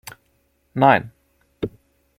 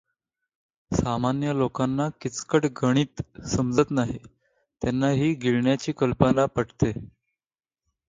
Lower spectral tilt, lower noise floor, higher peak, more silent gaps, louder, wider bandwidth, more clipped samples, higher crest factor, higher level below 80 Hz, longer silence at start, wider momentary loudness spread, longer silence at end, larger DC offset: about the same, -6.5 dB/octave vs -6.5 dB/octave; second, -65 dBFS vs under -90 dBFS; about the same, -2 dBFS vs -4 dBFS; neither; first, -20 LUFS vs -25 LUFS; first, 16.5 kHz vs 9.4 kHz; neither; about the same, 22 dB vs 22 dB; second, -56 dBFS vs -48 dBFS; second, 0.75 s vs 0.9 s; first, 24 LU vs 8 LU; second, 0.5 s vs 1 s; neither